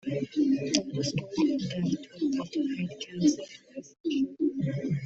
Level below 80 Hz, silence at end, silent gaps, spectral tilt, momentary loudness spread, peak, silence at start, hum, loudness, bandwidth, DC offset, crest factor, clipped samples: -66 dBFS; 0 s; 4.00-4.04 s; -5.5 dB/octave; 9 LU; -6 dBFS; 0.05 s; none; -30 LUFS; 8.2 kHz; under 0.1%; 24 dB; under 0.1%